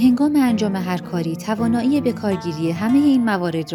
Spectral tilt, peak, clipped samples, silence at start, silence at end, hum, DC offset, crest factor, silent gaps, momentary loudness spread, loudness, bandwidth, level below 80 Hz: -6.5 dB/octave; -6 dBFS; under 0.1%; 0 s; 0 s; none; under 0.1%; 12 dB; none; 8 LU; -19 LUFS; 18.5 kHz; -56 dBFS